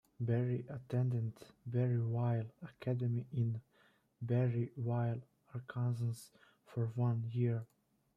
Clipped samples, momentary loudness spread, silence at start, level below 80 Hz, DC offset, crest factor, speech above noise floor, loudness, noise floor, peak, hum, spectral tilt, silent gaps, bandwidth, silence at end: under 0.1%; 12 LU; 0.2 s; -74 dBFS; under 0.1%; 14 dB; 29 dB; -38 LUFS; -65 dBFS; -24 dBFS; none; -9 dB/octave; none; 10.5 kHz; 0.5 s